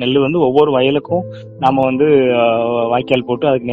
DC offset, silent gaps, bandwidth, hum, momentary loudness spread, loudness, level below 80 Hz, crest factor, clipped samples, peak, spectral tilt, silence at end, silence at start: under 0.1%; none; 5.4 kHz; none; 6 LU; -14 LUFS; -50 dBFS; 14 dB; under 0.1%; 0 dBFS; -4.5 dB/octave; 0 s; 0 s